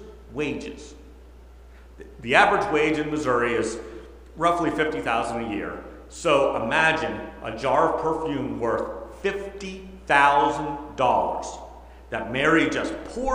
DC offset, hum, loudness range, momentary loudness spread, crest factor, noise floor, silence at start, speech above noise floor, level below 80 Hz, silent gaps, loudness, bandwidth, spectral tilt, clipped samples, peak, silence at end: under 0.1%; none; 3 LU; 18 LU; 24 dB; -46 dBFS; 0 s; 23 dB; -46 dBFS; none; -23 LUFS; 15.5 kHz; -4.5 dB/octave; under 0.1%; -2 dBFS; 0 s